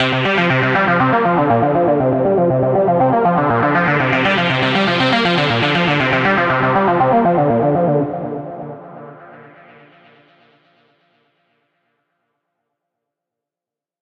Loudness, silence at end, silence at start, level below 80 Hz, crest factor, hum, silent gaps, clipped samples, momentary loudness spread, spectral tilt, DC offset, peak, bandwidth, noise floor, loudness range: -14 LUFS; 4.6 s; 0 s; -50 dBFS; 14 dB; none; none; under 0.1%; 9 LU; -7 dB/octave; under 0.1%; -2 dBFS; 8.8 kHz; -88 dBFS; 8 LU